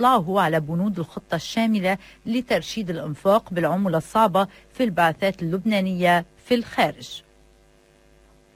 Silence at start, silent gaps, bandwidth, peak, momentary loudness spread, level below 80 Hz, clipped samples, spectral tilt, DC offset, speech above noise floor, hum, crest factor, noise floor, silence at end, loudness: 0 s; none; 16 kHz; -6 dBFS; 9 LU; -56 dBFS; under 0.1%; -6 dB/octave; under 0.1%; 34 dB; none; 18 dB; -56 dBFS; 1.35 s; -23 LUFS